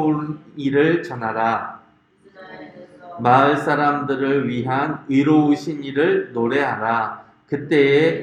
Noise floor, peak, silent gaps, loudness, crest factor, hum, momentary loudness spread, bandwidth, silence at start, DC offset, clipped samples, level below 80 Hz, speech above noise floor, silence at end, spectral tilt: -54 dBFS; 0 dBFS; none; -19 LUFS; 18 dB; none; 14 LU; 9.2 kHz; 0 s; under 0.1%; under 0.1%; -64 dBFS; 35 dB; 0 s; -7.5 dB/octave